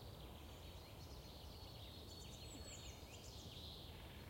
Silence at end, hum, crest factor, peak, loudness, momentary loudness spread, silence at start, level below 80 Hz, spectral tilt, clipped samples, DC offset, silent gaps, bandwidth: 0 s; none; 14 dB; -42 dBFS; -55 LUFS; 3 LU; 0 s; -62 dBFS; -4 dB/octave; under 0.1%; under 0.1%; none; 16.5 kHz